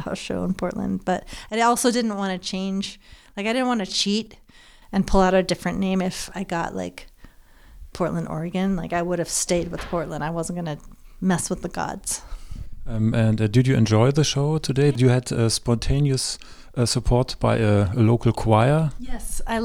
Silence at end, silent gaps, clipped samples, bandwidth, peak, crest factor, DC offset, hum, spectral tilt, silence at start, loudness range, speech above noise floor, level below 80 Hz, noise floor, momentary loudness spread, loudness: 0 s; none; under 0.1%; 16 kHz; -4 dBFS; 18 dB; under 0.1%; none; -5.5 dB/octave; 0 s; 7 LU; 26 dB; -36 dBFS; -48 dBFS; 12 LU; -23 LUFS